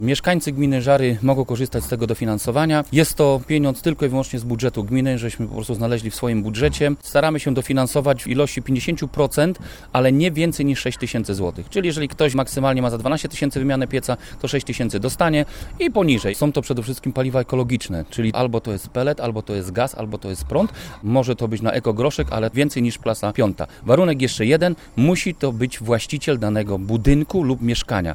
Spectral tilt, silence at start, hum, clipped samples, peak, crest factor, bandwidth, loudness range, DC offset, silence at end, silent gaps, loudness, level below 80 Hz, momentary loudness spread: -6 dB/octave; 0 s; none; under 0.1%; 0 dBFS; 20 dB; 19.5 kHz; 3 LU; under 0.1%; 0 s; none; -20 LUFS; -38 dBFS; 7 LU